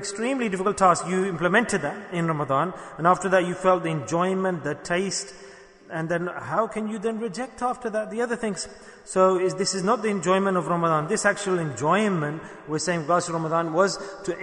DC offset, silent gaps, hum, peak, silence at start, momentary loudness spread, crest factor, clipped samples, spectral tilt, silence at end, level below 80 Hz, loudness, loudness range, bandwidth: under 0.1%; none; none; -6 dBFS; 0 s; 9 LU; 18 dB; under 0.1%; -5 dB/octave; 0 s; -60 dBFS; -24 LUFS; 5 LU; 10.5 kHz